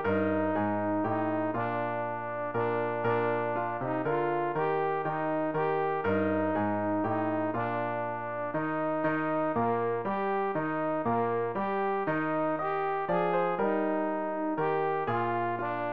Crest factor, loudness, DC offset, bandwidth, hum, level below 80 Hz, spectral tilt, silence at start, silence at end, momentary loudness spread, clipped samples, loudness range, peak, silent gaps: 12 dB; -30 LUFS; 0.4%; 5 kHz; none; -66 dBFS; -10 dB/octave; 0 s; 0 s; 3 LU; under 0.1%; 1 LU; -16 dBFS; none